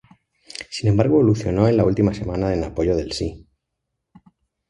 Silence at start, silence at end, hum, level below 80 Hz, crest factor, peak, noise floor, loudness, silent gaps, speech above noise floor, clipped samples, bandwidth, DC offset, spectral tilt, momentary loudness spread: 0.6 s; 1.3 s; none; -38 dBFS; 20 dB; -2 dBFS; -78 dBFS; -20 LUFS; none; 60 dB; under 0.1%; 11 kHz; under 0.1%; -7.5 dB/octave; 13 LU